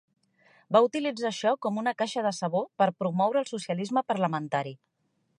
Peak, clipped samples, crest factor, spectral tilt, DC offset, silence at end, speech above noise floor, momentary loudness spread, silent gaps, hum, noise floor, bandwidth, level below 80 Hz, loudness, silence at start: -8 dBFS; under 0.1%; 20 dB; -5.5 dB/octave; under 0.1%; 0.65 s; 36 dB; 8 LU; none; none; -63 dBFS; 11 kHz; -80 dBFS; -28 LUFS; 0.7 s